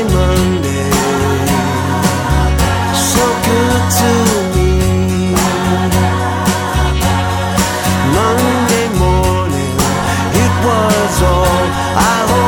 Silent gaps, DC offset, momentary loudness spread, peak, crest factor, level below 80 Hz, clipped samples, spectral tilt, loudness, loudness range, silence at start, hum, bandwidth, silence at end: none; under 0.1%; 3 LU; 0 dBFS; 12 dB; -22 dBFS; under 0.1%; -5 dB/octave; -13 LUFS; 1 LU; 0 s; none; 17.5 kHz; 0 s